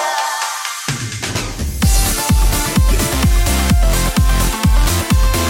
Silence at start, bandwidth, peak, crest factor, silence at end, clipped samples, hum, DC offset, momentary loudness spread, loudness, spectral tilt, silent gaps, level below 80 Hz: 0 s; 17 kHz; -4 dBFS; 10 dB; 0 s; under 0.1%; none; under 0.1%; 7 LU; -16 LUFS; -4 dB/octave; none; -16 dBFS